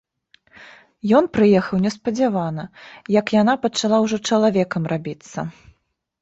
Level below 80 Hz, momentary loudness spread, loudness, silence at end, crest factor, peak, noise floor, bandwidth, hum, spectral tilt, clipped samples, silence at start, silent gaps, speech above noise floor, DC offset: -56 dBFS; 15 LU; -19 LUFS; 0.7 s; 16 dB; -4 dBFS; -65 dBFS; 8 kHz; none; -6 dB/octave; under 0.1%; 0.6 s; none; 46 dB; under 0.1%